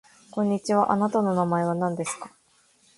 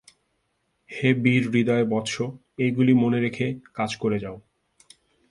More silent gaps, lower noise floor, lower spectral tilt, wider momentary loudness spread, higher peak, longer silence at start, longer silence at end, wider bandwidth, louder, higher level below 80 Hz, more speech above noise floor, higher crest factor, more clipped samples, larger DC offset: neither; second, -62 dBFS vs -73 dBFS; about the same, -6.5 dB/octave vs -6.5 dB/octave; about the same, 13 LU vs 11 LU; about the same, -8 dBFS vs -6 dBFS; second, 0.35 s vs 0.9 s; second, 0.7 s vs 0.9 s; about the same, 11.5 kHz vs 11.5 kHz; about the same, -25 LUFS vs -23 LUFS; second, -66 dBFS vs -60 dBFS; second, 38 dB vs 50 dB; about the same, 18 dB vs 20 dB; neither; neither